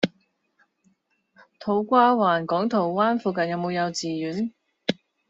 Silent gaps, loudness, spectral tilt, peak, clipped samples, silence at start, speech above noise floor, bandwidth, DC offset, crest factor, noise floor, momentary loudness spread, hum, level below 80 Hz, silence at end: none; -24 LUFS; -4 dB/octave; -4 dBFS; under 0.1%; 0 s; 45 dB; 8 kHz; under 0.1%; 20 dB; -67 dBFS; 12 LU; none; -70 dBFS; 0.35 s